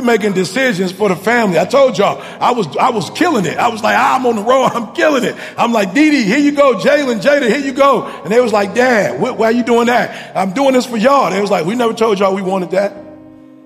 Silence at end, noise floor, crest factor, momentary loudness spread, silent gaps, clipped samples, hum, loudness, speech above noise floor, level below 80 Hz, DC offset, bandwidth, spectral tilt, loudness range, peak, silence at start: 0.45 s; -38 dBFS; 12 dB; 5 LU; none; under 0.1%; none; -13 LUFS; 25 dB; -58 dBFS; under 0.1%; 15.5 kHz; -5 dB/octave; 2 LU; 0 dBFS; 0 s